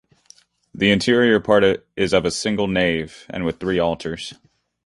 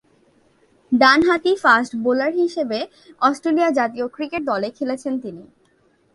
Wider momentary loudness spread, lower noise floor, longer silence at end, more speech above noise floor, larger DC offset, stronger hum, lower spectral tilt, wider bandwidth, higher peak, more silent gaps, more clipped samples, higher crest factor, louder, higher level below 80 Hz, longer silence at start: about the same, 12 LU vs 13 LU; second, -53 dBFS vs -60 dBFS; second, 0.5 s vs 0.7 s; second, 34 dB vs 41 dB; neither; neither; about the same, -5 dB/octave vs -4 dB/octave; about the same, 11.5 kHz vs 11.5 kHz; about the same, -2 dBFS vs 0 dBFS; neither; neither; about the same, 18 dB vs 20 dB; about the same, -19 LUFS vs -19 LUFS; first, -46 dBFS vs -60 dBFS; second, 0.75 s vs 0.9 s